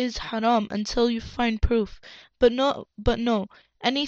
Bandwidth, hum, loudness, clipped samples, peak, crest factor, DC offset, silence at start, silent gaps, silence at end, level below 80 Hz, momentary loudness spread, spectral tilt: 7.8 kHz; none; -25 LUFS; under 0.1%; -6 dBFS; 18 dB; under 0.1%; 0 s; none; 0 s; -36 dBFS; 6 LU; -5.5 dB/octave